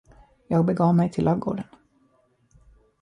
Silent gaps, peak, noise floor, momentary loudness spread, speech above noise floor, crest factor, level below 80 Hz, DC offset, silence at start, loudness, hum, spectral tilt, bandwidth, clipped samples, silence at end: none; -10 dBFS; -64 dBFS; 12 LU; 43 dB; 16 dB; -54 dBFS; under 0.1%; 0.5 s; -23 LUFS; none; -9.5 dB/octave; 10 kHz; under 0.1%; 1.4 s